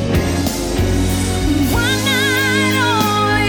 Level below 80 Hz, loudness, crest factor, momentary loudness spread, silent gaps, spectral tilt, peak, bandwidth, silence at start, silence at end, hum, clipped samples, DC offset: -26 dBFS; -15 LUFS; 12 dB; 4 LU; none; -4.5 dB/octave; -2 dBFS; 19.5 kHz; 0 s; 0 s; none; under 0.1%; under 0.1%